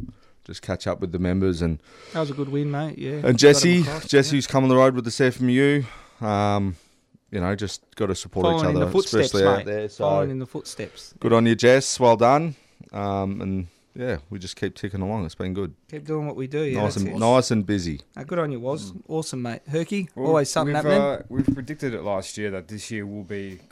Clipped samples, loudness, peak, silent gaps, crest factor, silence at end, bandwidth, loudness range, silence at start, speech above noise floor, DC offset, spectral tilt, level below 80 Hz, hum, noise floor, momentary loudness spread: under 0.1%; -23 LUFS; -4 dBFS; none; 20 dB; 0.15 s; 15 kHz; 8 LU; 0 s; 37 dB; under 0.1%; -5.5 dB/octave; -50 dBFS; none; -59 dBFS; 15 LU